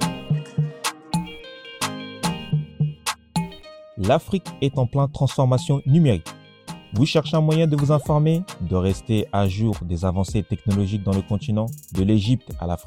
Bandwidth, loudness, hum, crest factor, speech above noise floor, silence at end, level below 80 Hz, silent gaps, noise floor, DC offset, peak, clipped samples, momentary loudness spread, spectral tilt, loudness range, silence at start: 16 kHz; -22 LUFS; none; 18 dB; 21 dB; 0.05 s; -44 dBFS; none; -42 dBFS; under 0.1%; -4 dBFS; under 0.1%; 10 LU; -6.5 dB/octave; 6 LU; 0 s